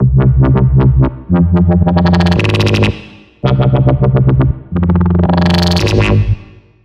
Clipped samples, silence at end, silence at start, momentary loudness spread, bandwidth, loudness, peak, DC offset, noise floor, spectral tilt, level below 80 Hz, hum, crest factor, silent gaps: under 0.1%; 0.4 s; 0 s; 5 LU; 9.2 kHz; -11 LUFS; 0 dBFS; under 0.1%; -35 dBFS; -7.5 dB/octave; -20 dBFS; none; 10 dB; none